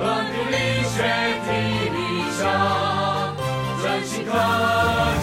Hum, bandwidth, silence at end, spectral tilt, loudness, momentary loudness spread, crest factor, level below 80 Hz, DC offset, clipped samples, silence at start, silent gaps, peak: none; 16 kHz; 0 s; -4.5 dB/octave; -22 LUFS; 5 LU; 14 dB; -42 dBFS; under 0.1%; under 0.1%; 0 s; none; -8 dBFS